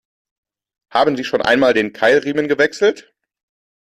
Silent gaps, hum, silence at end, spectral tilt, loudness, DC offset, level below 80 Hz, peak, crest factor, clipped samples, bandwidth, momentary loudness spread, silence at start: none; none; 0.8 s; -4.5 dB/octave; -16 LUFS; under 0.1%; -58 dBFS; -2 dBFS; 16 dB; under 0.1%; 13 kHz; 5 LU; 0.95 s